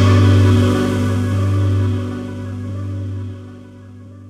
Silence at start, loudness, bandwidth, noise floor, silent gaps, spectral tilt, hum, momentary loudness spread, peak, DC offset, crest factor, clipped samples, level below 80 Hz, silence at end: 0 s; -17 LUFS; 10 kHz; -37 dBFS; none; -7.5 dB/octave; none; 18 LU; -2 dBFS; under 0.1%; 14 dB; under 0.1%; -42 dBFS; 0 s